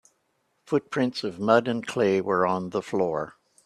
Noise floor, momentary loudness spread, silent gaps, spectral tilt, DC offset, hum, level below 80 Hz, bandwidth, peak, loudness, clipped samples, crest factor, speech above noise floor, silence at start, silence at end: -72 dBFS; 7 LU; none; -6 dB/octave; under 0.1%; none; -66 dBFS; 12.5 kHz; -4 dBFS; -25 LUFS; under 0.1%; 22 dB; 48 dB; 0.7 s; 0.35 s